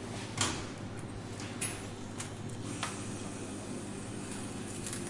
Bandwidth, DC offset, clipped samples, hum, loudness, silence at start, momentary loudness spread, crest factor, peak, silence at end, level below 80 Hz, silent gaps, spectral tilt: 11.5 kHz; under 0.1%; under 0.1%; none; -39 LUFS; 0 s; 9 LU; 26 dB; -14 dBFS; 0 s; -58 dBFS; none; -3.5 dB/octave